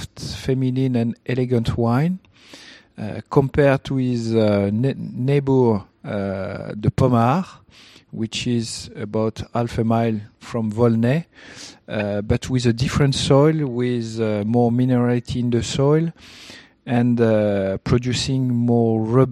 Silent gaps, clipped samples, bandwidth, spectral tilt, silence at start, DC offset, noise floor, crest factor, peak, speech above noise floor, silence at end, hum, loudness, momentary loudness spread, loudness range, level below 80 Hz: none; under 0.1%; 12 kHz; -7 dB/octave; 0 s; under 0.1%; -44 dBFS; 20 dB; 0 dBFS; 25 dB; 0 s; none; -20 LUFS; 12 LU; 4 LU; -44 dBFS